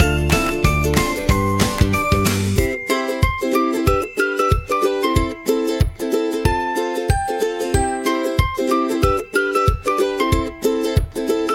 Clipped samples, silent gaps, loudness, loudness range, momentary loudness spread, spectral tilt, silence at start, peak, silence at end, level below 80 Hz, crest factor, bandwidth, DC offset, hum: under 0.1%; none; -19 LUFS; 2 LU; 4 LU; -5.5 dB/octave; 0 s; 0 dBFS; 0 s; -28 dBFS; 18 dB; 17 kHz; under 0.1%; none